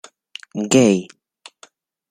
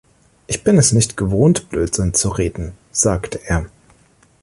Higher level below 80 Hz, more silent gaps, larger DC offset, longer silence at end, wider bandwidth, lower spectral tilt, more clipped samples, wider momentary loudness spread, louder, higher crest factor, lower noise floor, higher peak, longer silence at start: second, -60 dBFS vs -32 dBFS; neither; neither; first, 1.05 s vs 0.75 s; first, 15.5 kHz vs 11.5 kHz; about the same, -4.5 dB/octave vs -5 dB/octave; neither; first, 24 LU vs 11 LU; about the same, -17 LUFS vs -17 LUFS; about the same, 20 dB vs 16 dB; about the same, -52 dBFS vs -53 dBFS; about the same, -2 dBFS vs -2 dBFS; about the same, 0.55 s vs 0.5 s